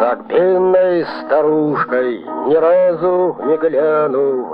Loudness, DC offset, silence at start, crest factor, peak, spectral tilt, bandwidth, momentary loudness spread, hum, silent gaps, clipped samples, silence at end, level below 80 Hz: -15 LUFS; under 0.1%; 0 s; 12 dB; -2 dBFS; -10 dB/octave; 5.2 kHz; 5 LU; none; none; under 0.1%; 0 s; -66 dBFS